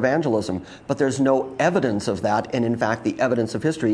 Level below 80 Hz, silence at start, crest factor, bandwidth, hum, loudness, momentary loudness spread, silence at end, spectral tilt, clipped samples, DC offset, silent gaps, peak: -56 dBFS; 0 s; 16 dB; 10.5 kHz; none; -22 LUFS; 4 LU; 0 s; -6 dB/octave; under 0.1%; under 0.1%; none; -4 dBFS